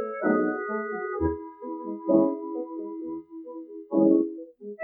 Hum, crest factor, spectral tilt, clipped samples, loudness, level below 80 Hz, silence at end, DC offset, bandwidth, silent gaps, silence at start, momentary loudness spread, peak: none; 20 dB; -13 dB/octave; under 0.1%; -27 LUFS; -52 dBFS; 0 s; under 0.1%; 2.3 kHz; none; 0 s; 18 LU; -8 dBFS